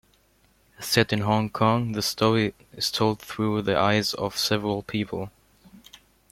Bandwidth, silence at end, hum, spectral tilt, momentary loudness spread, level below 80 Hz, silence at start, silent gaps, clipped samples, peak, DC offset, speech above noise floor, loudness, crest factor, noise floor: 16.5 kHz; 0.5 s; none; -4.5 dB/octave; 8 LU; -56 dBFS; 0.8 s; none; under 0.1%; -2 dBFS; under 0.1%; 38 dB; -24 LUFS; 24 dB; -62 dBFS